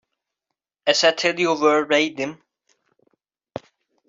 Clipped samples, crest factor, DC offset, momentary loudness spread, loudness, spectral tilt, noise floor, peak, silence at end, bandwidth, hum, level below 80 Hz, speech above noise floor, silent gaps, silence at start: under 0.1%; 20 dB; under 0.1%; 21 LU; -19 LUFS; -2.5 dB/octave; -83 dBFS; -4 dBFS; 1.75 s; 7.8 kHz; none; -70 dBFS; 64 dB; none; 0.85 s